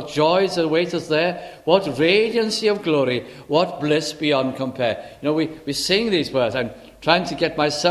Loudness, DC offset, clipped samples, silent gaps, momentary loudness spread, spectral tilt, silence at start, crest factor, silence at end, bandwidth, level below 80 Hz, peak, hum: -20 LUFS; under 0.1%; under 0.1%; none; 7 LU; -4.5 dB/octave; 0 s; 20 dB; 0 s; 14 kHz; -54 dBFS; -2 dBFS; none